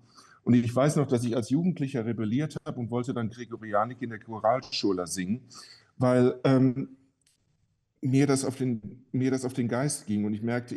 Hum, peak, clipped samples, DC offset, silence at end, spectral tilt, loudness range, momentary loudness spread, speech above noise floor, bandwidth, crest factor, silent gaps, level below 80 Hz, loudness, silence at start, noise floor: none; -10 dBFS; under 0.1%; under 0.1%; 0 s; -6.5 dB/octave; 3 LU; 12 LU; 45 dB; 12.5 kHz; 16 dB; none; -66 dBFS; -28 LUFS; 0.45 s; -73 dBFS